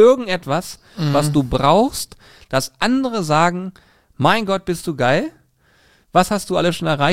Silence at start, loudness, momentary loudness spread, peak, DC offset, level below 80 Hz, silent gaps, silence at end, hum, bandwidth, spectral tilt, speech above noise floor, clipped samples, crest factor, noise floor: 0 s; -18 LUFS; 10 LU; 0 dBFS; 0.9%; -42 dBFS; none; 0 s; none; 16.5 kHz; -5 dB/octave; 39 dB; under 0.1%; 16 dB; -56 dBFS